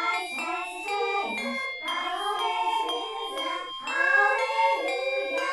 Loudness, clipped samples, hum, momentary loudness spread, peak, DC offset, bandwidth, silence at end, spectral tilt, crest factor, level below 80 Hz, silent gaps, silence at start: -27 LUFS; under 0.1%; none; 9 LU; -10 dBFS; under 0.1%; 13.5 kHz; 0 s; -0.5 dB/octave; 18 dB; -70 dBFS; none; 0 s